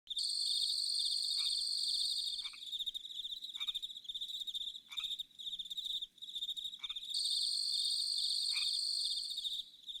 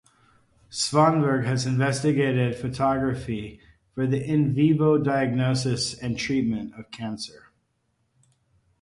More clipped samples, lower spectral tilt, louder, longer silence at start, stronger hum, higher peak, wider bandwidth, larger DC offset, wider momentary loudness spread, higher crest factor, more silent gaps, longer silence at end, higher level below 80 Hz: neither; second, 4.5 dB/octave vs -6 dB/octave; second, -36 LUFS vs -24 LUFS; second, 0.05 s vs 0.7 s; neither; second, -22 dBFS vs -6 dBFS; first, over 20 kHz vs 11.5 kHz; neither; second, 9 LU vs 15 LU; about the same, 16 dB vs 18 dB; neither; second, 0 s vs 1.55 s; second, -76 dBFS vs -54 dBFS